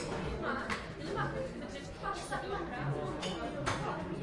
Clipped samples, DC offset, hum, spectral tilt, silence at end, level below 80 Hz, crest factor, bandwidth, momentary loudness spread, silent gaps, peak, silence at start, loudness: under 0.1%; under 0.1%; none; -5 dB/octave; 0 s; -52 dBFS; 18 dB; 11.5 kHz; 4 LU; none; -20 dBFS; 0 s; -38 LUFS